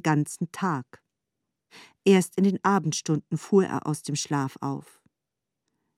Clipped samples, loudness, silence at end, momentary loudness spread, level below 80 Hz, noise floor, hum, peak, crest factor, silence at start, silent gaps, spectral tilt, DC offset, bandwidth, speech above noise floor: under 0.1%; -26 LUFS; 1.2 s; 11 LU; -74 dBFS; -86 dBFS; none; -8 dBFS; 18 dB; 0.05 s; none; -5.5 dB/octave; under 0.1%; 14 kHz; 60 dB